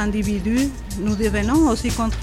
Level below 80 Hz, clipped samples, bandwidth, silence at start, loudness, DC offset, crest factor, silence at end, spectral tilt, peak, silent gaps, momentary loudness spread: -30 dBFS; under 0.1%; 16 kHz; 0 s; -21 LUFS; 0.2%; 12 dB; 0 s; -5.5 dB/octave; -8 dBFS; none; 7 LU